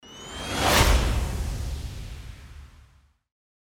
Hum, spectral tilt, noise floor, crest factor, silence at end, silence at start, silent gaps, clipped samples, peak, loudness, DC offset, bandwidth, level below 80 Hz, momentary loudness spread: none; -3.5 dB/octave; -58 dBFS; 22 dB; 1.1 s; 0.05 s; none; under 0.1%; -6 dBFS; -25 LUFS; under 0.1%; 19.5 kHz; -30 dBFS; 22 LU